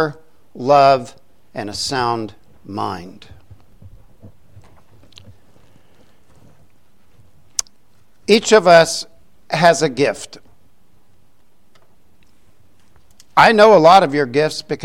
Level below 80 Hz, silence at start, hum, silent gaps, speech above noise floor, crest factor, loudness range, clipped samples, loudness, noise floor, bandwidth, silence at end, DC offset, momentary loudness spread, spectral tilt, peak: -54 dBFS; 0 s; none; none; 46 dB; 18 dB; 18 LU; under 0.1%; -14 LUFS; -60 dBFS; 16 kHz; 0 s; 0.7%; 21 LU; -4 dB/octave; 0 dBFS